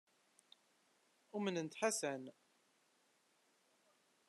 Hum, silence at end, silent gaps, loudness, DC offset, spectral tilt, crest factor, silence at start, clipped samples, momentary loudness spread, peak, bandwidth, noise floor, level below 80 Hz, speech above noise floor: none; 1.95 s; none; -42 LUFS; under 0.1%; -3.5 dB/octave; 24 dB; 1.35 s; under 0.1%; 12 LU; -22 dBFS; 13 kHz; -77 dBFS; under -90 dBFS; 36 dB